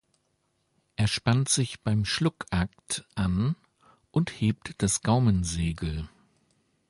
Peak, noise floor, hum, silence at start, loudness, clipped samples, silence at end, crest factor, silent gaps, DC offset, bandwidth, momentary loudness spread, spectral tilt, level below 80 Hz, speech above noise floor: -12 dBFS; -74 dBFS; none; 1 s; -27 LUFS; under 0.1%; 0.8 s; 18 dB; none; under 0.1%; 11.5 kHz; 10 LU; -5 dB/octave; -44 dBFS; 47 dB